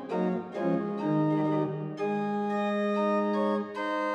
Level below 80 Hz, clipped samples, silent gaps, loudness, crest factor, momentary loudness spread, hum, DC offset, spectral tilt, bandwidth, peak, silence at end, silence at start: -80 dBFS; under 0.1%; none; -29 LUFS; 12 dB; 5 LU; none; under 0.1%; -8 dB/octave; 8.4 kHz; -16 dBFS; 0 s; 0 s